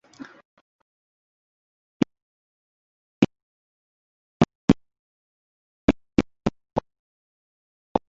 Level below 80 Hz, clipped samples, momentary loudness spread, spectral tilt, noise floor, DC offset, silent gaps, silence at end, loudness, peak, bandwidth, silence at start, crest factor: -46 dBFS; under 0.1%; 9 LU; -6.5 dB/octave; under -90 dBFS; under 0.1%; 0.45-2.00 s, 2.22-3.22 s, 3.42-4.40 s, 4.55-4.68 s, 4.99-5.88 s, 6.99-7.95 s; 0.1 s; -26 LUFS; -2 dBFS; 7.6 kHz; 0.2 s; 28 dB